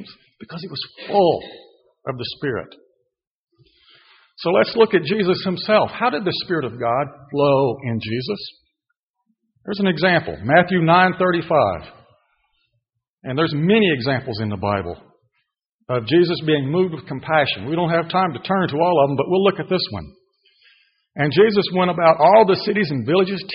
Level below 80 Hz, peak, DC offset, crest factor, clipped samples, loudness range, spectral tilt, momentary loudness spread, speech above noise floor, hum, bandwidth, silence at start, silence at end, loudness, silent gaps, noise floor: -56 dBFS; -2 dBFS; under 0.1%; 18 dB; under 0.1%; 6 LU; -4 dB/octave; 15 LU; 58 dB; none; 5.6 kHz; 0 s; 0 s; -19 LUFS; 3.27-3.47 s, 8.99-9.14 s, 13.10-13.18 s, 15.66-15.79 s; -76 dBFS